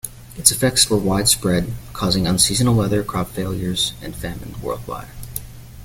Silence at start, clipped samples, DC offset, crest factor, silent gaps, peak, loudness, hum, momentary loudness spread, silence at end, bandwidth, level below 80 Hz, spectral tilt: 0.05 s; under 0.1%; under 0.1%; 20 dB; none; 0 dBFS; -18 LUFS; none; 16 LU; 0 s; 17 kHz; -38 dBFS; -3.5 dB/octave